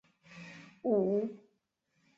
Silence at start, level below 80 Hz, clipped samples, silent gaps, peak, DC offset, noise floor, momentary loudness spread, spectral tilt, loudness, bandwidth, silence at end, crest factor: 0.3 s; -80 dBFS; under 0.1%; none; -18 dBFS; under 0.1%; -79 dBFS; 21 LU; -8.5 dB/octave; -33 LUFS; 7.4 kHz; 0.8 s; 18 dB